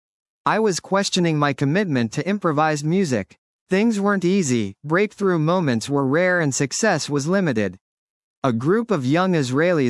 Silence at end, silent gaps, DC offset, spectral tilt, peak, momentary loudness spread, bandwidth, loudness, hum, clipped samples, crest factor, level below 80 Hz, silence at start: 0 s; 3.38-3.66 s, 7.81-8.42 s; under 0.1%; -5.5 dB/octave; -4 dBFS; 5 LU; 12 kHz; -20 LUFS; none; under 0.1%; 16 dB; -68 dBFS; 0.45 s